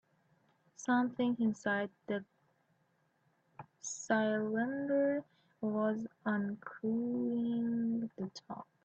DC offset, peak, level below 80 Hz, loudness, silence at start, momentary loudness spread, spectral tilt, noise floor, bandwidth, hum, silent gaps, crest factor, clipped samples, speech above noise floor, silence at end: under 0.1%; -18 dBFS; -80 dBFS; -36 LUFS; 0.8 s; 11 LU; -5.5 dB/octave; -76 dBFS; 8.2 kHz; none; none; 18 dB; under 0.1%; 41 dB; 0.2 s